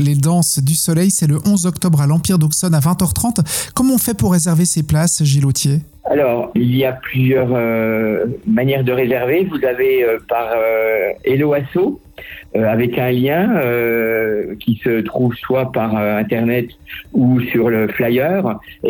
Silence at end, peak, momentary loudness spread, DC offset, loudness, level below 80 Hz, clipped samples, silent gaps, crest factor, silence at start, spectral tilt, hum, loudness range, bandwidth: 0 s; -2 dBFS; 5 LU; under 0.1%; -16 LUFS; -42 dBFS; under 0.1%; none; 14 dB; 0 s; -5.5 dB/octave; none; 2 LU; 19.5 kHz